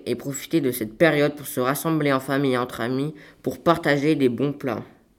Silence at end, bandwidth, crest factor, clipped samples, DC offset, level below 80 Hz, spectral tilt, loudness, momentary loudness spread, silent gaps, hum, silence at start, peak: 0.3 s; 17.5 kHz; 20 dB; under 0.1%; under 0.1%; -60 dBFS; -5.5 dB/octave; -23 LUFS; 10 LU; none; none; 0 s; -4 dBFS